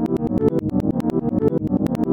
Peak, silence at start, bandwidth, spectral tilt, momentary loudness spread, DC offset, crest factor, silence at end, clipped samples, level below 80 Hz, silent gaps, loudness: -4 dBFS; 0 s; 16.5 kHz; -10 dB/octave; 2 LU; under 0.1%; 16 dB; 0 s; under 0.1%; -42 dBFS; none; -21 LUFS